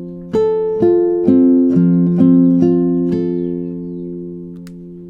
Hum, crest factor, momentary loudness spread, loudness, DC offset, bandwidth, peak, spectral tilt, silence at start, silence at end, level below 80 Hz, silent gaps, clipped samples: none; 14 dB; 18 LU; -13 LUFS; under 0.1%; 4.2 kHz; 0 dBFS; -11.5 dB/octave; 0 s; 0 s; -50 dBFS; none; under 0.1%